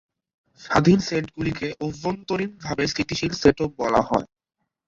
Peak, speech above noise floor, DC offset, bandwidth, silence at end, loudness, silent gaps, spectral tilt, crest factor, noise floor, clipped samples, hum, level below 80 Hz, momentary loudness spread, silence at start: -2 dBFS; 57 dB; under 0.1%; 7.8 kHz; 0.65 s; -23 LUFS; none; -5.5 dB/octave; 22 dB; -80 dBFS; under 0.1%; none; -48 dBFS; 10 LU; 0.6 s